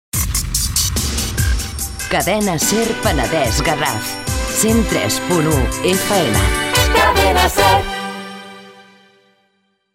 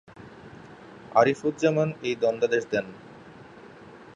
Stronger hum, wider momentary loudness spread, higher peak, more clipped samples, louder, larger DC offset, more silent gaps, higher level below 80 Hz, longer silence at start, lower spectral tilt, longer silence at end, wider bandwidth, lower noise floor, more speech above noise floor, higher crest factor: neither; second, 10 LU vs 25 LU; first, 0 dBFS vs -6 dBFS; neither; first, -16 LUFS vs -25 LUFS; neither; neither; first, -26 dBFS vs -64 dBFS; about the same, 0.15 s vs 0.2 s; second, -3.5 dB/octave vs -6 dB/octave; first, 1.15 s vs 0.2 s; first, 16.5 kHz vs 9.8 kHz; first, -64 dBFS vs -47 dBFS; first, 49 dB vs 23 dB; second, 16 dB vs 22 dB